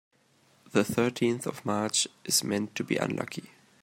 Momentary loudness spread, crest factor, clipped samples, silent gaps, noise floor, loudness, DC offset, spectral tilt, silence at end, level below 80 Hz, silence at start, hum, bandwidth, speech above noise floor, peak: 7 LU; 22 dB; under 0.1%; none; -65 dBFS; -29 LUFS; under 0.1%; -3.5 dB/octave; 0.35 s; -70 dBFS; 0.75 s; none; 16 kHz; 36 dB; -8 dBFS